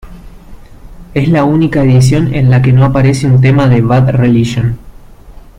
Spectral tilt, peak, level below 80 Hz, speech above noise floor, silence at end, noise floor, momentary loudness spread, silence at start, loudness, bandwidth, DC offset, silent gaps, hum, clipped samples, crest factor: -7.5 dB/octave; 0 dBFS; -30 dBFS; 25 dB; 0.2 s; -33 dBFS; 7 LU; 0.05 s; -9 LUFS; 10.5 kHz; under 0.1%; none; none; under 0.1%; 10 dB